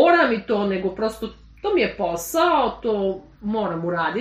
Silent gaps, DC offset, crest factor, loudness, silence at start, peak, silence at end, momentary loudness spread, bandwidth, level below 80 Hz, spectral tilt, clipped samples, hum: none; under 0.1%; 18 dB; -22 LUFS; 0 s; -4 dBFS; 0 s; 10 LU; 15 kHz; -48 dBFS; -5 dB/octave; under 0.1%; none